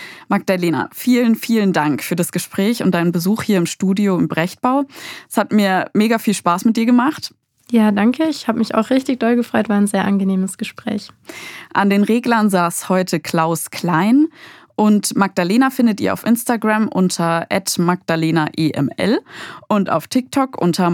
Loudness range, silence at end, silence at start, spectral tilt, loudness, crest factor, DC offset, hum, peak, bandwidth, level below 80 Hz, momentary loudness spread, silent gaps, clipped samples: 2 LU; 0 s; 0 s; -5.5 dB/octave; -17 LUFS; 16 dB; under 0.1%; none; 0 dBFS; 18.5 kHz; -68 dBFS; 6 LU; none; under 0.1%